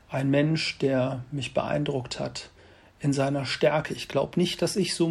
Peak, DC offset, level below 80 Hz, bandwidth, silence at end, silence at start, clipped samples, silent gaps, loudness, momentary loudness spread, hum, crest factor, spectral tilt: -10 dBFS; under 0.1%; -58 dBFS; 13.5 kHz; 0 s; 0.1 s; under 0.1%; none; -27 LUFS; 9 LU; none; 16 dB; -5.5 dB/octave